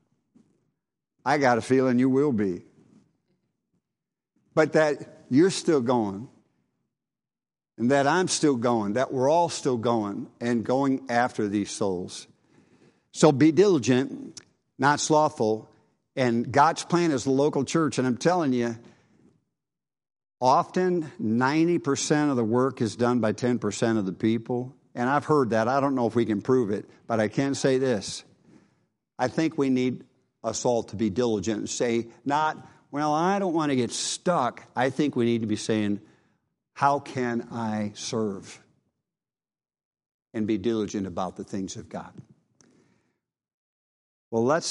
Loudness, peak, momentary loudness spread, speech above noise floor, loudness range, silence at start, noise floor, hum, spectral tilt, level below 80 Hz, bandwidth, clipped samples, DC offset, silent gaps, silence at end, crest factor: -25 LUFS; -4 dBFS; 11 LU; over 66 dB; 8 LU; 1.25 s; under -90 dBFS; none; -5.5 dB/octave; -68 dBFS; 11.5 kHz; under 0.1%; under 0.1%; 39.85-39.91 s, 40.06-40.19 s, 43.54-44.31 s; 0 s; 22 dB